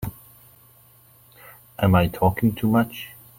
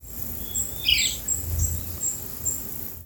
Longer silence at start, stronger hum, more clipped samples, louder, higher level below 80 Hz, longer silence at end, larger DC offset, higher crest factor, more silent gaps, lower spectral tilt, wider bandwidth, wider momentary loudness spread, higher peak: about the same, 0 s vs 0 s; neither; neither; first, -21 LUFS vs -25 LUFS; second, -46 dBFS vs -40 dBFS; first, 0.3 s vs 0 s; neither; about the same, 20 dB vs 20 dB; neither; first, -7.5 dB/octave vs -1 dB/octave; second, 17 kHz vs over 20 kHz; first, 17 LU vs 9 LU; first, -4 dBFS vs -8 dBFS